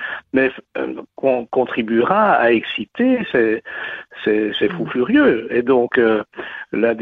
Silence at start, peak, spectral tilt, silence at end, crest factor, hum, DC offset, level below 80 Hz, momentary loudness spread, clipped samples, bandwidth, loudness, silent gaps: 0 s; -4 dBFS; -8 dB/octave; 0 s; 14 dB; none; under 0.1%; -56 dBFS; 12 LU; under 0.1%; 4.7 kHz; -18 LUFS; none